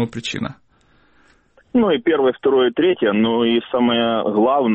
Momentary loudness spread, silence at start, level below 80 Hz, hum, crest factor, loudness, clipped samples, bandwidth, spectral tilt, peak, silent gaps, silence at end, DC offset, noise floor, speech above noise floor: 8 LU; 0 s; -56 dBFS; none; 12 dB; -18 LUFS; under 0.1%; 8.4 kHz; -6 dB/octave; -6 dBFS; none; 0 s; under 0.1%; -56 dBFS; 39 dB